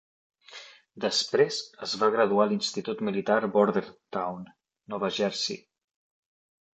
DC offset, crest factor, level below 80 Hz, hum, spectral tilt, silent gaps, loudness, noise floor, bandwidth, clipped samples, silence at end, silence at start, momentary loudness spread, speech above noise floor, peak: under 0.1%; 20 dB; -74 dBFS; none; -4 dB/octave; none; -27 LUFS; -49 dBFS; 8.8 kHz; under 0.1%; 1.2 s; 0.5 s; 17 LU; 22 dB; -8 dBFS